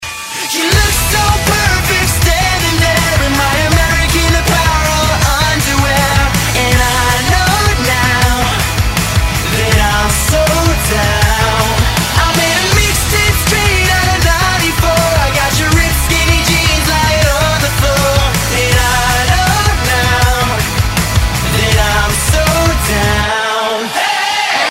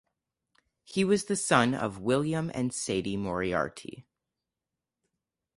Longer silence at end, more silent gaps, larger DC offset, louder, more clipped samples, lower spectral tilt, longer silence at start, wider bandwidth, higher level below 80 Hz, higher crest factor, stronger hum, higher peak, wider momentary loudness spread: second, 0 s vs 1.55 s; neither; neither; first, -11 LUFS vs -29 LUFS; neither; about the same, -3.5 dB/octave vs -4.5 dB/octave; second, 0 s vs 0.9 s; first, 16.5 kHz vs 11.5 kHz; first, -18 dBFS vs -60 dBFS; second, 12 dB vs 24 dB; neither; first, 0 dBFS vs -8 dBFS; second, 3 LU vs 10 LU